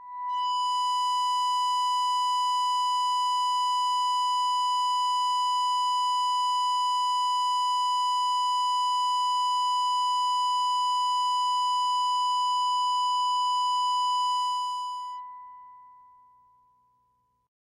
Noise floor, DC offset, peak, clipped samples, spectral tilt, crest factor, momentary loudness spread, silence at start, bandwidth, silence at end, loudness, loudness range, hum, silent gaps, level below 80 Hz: -71 dBFS; under 0.1%; -20 dBFS; under 0.1%; 5.5 dB/octave; 8 dB; 1 LU; 0 s; 13.5 kHz; 1.9 s; -26 LUFS; 3 LU; 60 Hz at -85 dBFS; none; under -90 dBFS